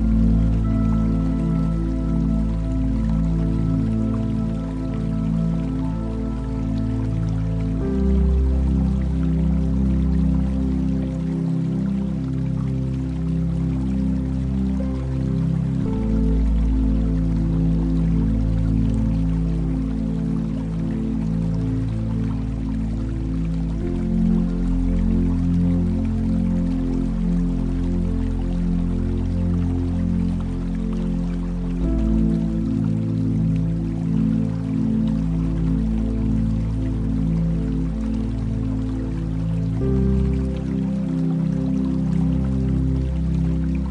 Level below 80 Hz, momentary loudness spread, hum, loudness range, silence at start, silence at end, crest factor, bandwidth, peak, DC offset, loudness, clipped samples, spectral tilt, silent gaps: -26 dBFS; 4 LU; none; 2 LU; 0 s; 0 s; 12 dB; 8.6 kHz; -8 dBFS; under 0.1%; -22 LUFS; under 0.1%; -9.5 dB/octave; none